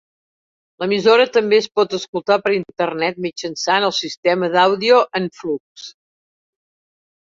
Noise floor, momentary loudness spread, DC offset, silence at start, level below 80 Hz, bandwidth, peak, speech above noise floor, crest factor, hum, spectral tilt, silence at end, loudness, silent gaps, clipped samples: under -90 dBFS; 12 LU; under 0.1%; 0.8 s; -66 dBFS; 7.6 kHz; -2 dBFS; over 73 dB; 18 dB; none; -4 dB/octave; 1.4 s; -17 LUFS; 2.08-2.13 s, 4.17-4.23 s, 5.60-5.75 s; under 0.1%